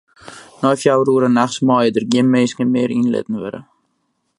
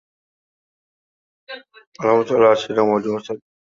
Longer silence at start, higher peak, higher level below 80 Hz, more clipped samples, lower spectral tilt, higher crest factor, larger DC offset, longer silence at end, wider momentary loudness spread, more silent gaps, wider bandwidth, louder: second, 0.25 s vs 1.5 s; about the same, 0 dBFS vs -2 dBFS; about the same, -62 dBFS vs -64 dBFS; neither; about the same, -6 dB/octave vs -6 dB/octave; about the same, 16 dB vs 20 dB; neither; first, 0.75 s vs 0.3 s; second, 10 LU vs 22 LU; second, none vs 1.87-1.92 s; first, 11.5 kHz vs 7.4 kHz; about the same, -16 LUFS vs -18 LUFS